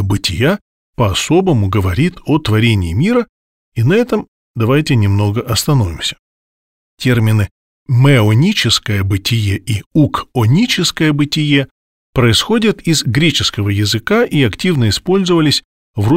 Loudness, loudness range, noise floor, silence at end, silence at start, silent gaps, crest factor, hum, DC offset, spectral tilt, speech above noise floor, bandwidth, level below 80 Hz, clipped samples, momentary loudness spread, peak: -14 LUFS; 2 LU; under -90 dBFS; 0 s; 0 s; 0.61-0.93 s, 3.29-3.72 s, 4.28-4.54 s, 6.19-6.98 s, 7.51-7.86 s, 9.86-9.91 s, 11.71-12.13 s, 15.65-15.94 s; 12 dB; none; 0.4%; -5.5 dB/octave; over 77 dB; 16 kHz; -38 dBFS; under 0.1%; 8 LU; 0 dBFS